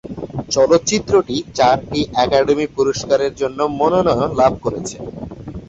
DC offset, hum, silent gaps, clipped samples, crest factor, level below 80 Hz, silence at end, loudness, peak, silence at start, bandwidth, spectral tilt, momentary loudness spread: under 0.1%; none; none; under 0.1%; 16 dB; -42 dBFS; 0 s; -16 LUFS; -2 dBFS; 0.05 s; 8.2 kHz; -4.5 dB/octave; 13 LU